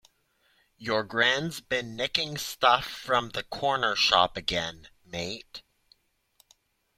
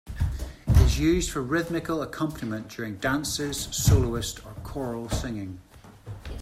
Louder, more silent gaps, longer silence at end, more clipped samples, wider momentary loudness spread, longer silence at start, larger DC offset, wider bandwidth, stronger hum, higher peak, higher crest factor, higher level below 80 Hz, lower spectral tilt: about the same, -26 LUFS vs -27 LUFS; neither; first, 1.4 s vs 0 s; neither; second, 14 LU vs 17 LU; first, 0.8 s vs 0.05 s; neither; about the same, 16.5 kHz vs 16 kHz; neither; about the same, -4 dBFS vs -6 dBFS; about the same, 24 dB vs 20 dB; second, -58 dBFS vs -32 dBFS; second, -2.5 dB/octave vs -5 dB/octave